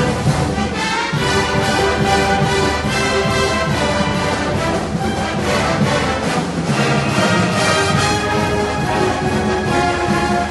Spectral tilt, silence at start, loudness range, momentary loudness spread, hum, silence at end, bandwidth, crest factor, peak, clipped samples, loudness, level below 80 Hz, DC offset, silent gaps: -4.5 dB/octave; 0 s; 1 LU; 4 LU; none; 0 s; 12 kHz; 14 dB; -2 dBFS; under 0.1%; -16 LUFS; -32 dBFS; under 0.1%; none